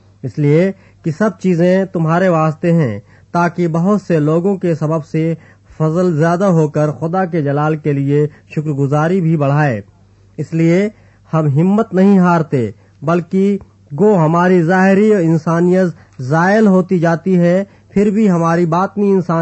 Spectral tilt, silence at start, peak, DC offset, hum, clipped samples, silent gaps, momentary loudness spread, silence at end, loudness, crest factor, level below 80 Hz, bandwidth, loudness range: -8.5 dB/octave; 0.25 s; -2 dBFS; under 0.1%; none; under 0.1%; none; 9 LU; 0 s; -14 LUFS; 12 dB; -54 dBFS; 8.4 kHz; 3 LU